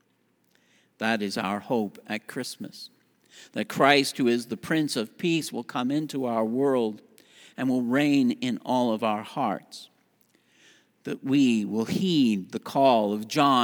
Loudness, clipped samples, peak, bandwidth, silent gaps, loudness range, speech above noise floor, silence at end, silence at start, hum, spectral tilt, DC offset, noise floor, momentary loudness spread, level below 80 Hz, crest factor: -26 LUFS; under 0.1%; -4 dBFS; over 20 kHz; none; 4 LU; 43 dB; 0 s; 1 s; none; -5 dB/octave; under 0.1%; -69 dBFS; 14 LU; -76 dBFS; 22 dB